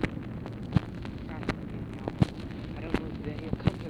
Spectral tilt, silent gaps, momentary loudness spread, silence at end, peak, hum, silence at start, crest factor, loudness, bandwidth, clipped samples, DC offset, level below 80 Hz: -8 dB/octave; none; 9 LU; 0 s; -8 dBFS; none; 0 s; 24 dB; -34 LUFS; 11.5 kHz; under 0.1%; under 0.1%; -44 dBFS